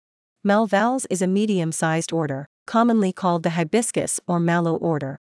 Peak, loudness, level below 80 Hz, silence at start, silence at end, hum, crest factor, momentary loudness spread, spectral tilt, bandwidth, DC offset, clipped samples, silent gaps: -6 dBFS; -22 LUFS; -70 dBFS; 0.45 s; 0.2 s; none; 14 dB; 6 LU; -5.5 dB/octave; 12 kHz; under 0.1%; under 0.1%; 2.46-2.66 s